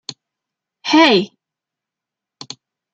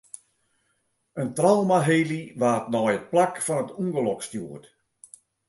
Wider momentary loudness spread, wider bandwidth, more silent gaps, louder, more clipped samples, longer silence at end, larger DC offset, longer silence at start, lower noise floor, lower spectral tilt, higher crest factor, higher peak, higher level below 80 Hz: first, 23 LU vs 19 LU; second, 8 kHz vs 12 kHz; neither; first, -13 LUFS vs -24 LUFS; neither; first, 1.65 s vs 0.9 s; neither; second, 0.1 s vs 1.15 s; first, -85 dBFS vs -72 dBFS; second, -4 dB/octave vs -5.5 dB/octave; about the same, 20 dB vs 20 dB; first, -2 dBFS vs -6 dBFS; about the same, -68 dBFS vs -70 dBFS